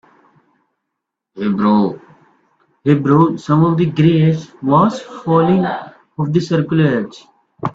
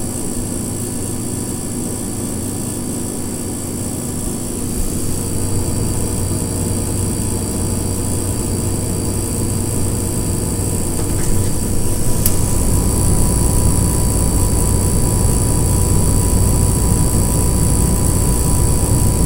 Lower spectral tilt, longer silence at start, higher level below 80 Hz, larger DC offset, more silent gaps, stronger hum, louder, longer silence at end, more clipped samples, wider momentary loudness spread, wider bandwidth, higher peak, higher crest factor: first, -8.5 dB/octave vs -5 dB/octave; first, 1.35 s vs 0 s; second, -54 dBFS vs -22 dBFS; neither; neither; neither; first, -15 LUFS vs -18 LUFS; about the same, 0.05 s vs 0 s; neither; first, 12 LU vs 7 LU; second, 7.6 kHz vs 16 kHz; about the same, 0 dBFS vs 0 dBFS; about the same, 16 dB vs 16 dB